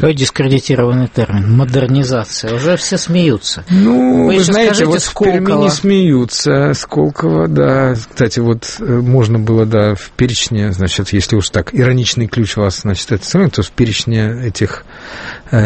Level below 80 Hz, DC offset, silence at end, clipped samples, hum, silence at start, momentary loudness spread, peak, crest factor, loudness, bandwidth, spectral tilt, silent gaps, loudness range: -36 dBFS; under 0.1%; 0 s; under 0.1%; none; 0 s; 7 LU; 0 dBFS; 12 dB; -13 LUFS; 8.8 kHz; -5.5 dB/octave; none; 3 LU